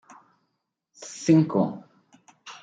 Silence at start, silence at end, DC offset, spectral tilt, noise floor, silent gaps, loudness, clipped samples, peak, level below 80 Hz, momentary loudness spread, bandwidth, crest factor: 1 s; 0.1 s; under 0.1%; -7 dB/octave; -79 dBFS; none; -23 LUFS; under 0.1%; -8 dBFS; -74 dBFS; 24 LU; 9.2 kHz; 20 dB